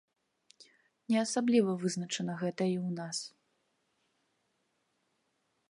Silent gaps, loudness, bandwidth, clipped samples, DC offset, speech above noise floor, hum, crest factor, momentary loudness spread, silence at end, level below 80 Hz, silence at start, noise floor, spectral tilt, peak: none; -32 LUFS; 11.5 kHz; under 0.1%; under 0.1%; 47 dB; none; 20 dB; 10 LU; 2.4 s; -84 dBFS; 0.6 s; -78 dBFS; -5 dB/octave; -16 dBFS